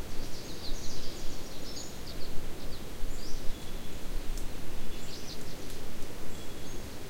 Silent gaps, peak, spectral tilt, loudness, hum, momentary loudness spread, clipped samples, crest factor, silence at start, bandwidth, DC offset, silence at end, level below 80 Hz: none; -14 dBFS; -4 dB/octave; -42 LUFS; none; 3 LU; under 0.1%; 12 dB; 0 s; 16 kHz; under 0.1%; 0 s; -38 dBFS